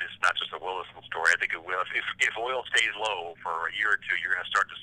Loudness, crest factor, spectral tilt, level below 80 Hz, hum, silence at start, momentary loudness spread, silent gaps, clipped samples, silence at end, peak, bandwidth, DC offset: -27 LUFS; 22 dB; 0 dB/octave; -68 dBFS; none; 0 s; 9 LU; none; under 0.1%; 0 s; -6 dBFS; 16 kHz; under 0.1%